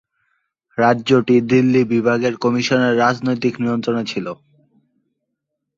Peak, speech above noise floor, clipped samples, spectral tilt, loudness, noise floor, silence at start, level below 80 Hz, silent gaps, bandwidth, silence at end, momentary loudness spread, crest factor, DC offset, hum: -2 dBFS; 61 dB; under 0.1%; -6 dB/octave; -17 LUFS; -77 dBFS; 0.75 s; -58 dBFS; none; 7.6 kHz; 1.45 s; 11 LU; 16 dB; under 0.1%; none